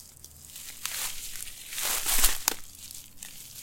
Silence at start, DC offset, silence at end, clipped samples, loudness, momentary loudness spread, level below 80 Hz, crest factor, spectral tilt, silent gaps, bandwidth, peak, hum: 0 s; under 0.1%; 0 s; under 0.1%; -28 LUFS; 20 LU; -40 dBFS; 26 dB; 0.5 dB/octave; none; 17 kHz; -4 dBFS; none